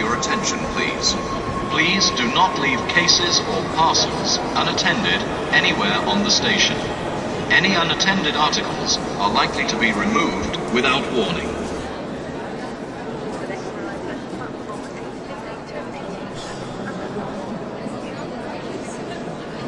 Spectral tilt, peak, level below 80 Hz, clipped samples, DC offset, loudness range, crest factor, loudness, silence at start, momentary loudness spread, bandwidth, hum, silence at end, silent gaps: -3 dB/octave; 0 dBFS; -44 dBFS; under 0.1%; under 0.1%; 13 LU; 20 dB; -20 LUFS; 0 s; 14 LU; 11.5 kHz; none; 0 s; none